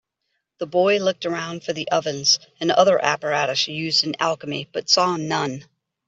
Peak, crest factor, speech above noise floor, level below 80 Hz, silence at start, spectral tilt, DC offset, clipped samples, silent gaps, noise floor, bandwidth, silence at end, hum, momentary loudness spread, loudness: -2 dBFS; 20 dB; 55 dB; -68 dBFS; 0.6 s; -3 dB/octave; under 0.1%; under 0.1%; none; -76 dBFS; 8 kHz; 0.45 s; none; 10 LU; -21 LUFS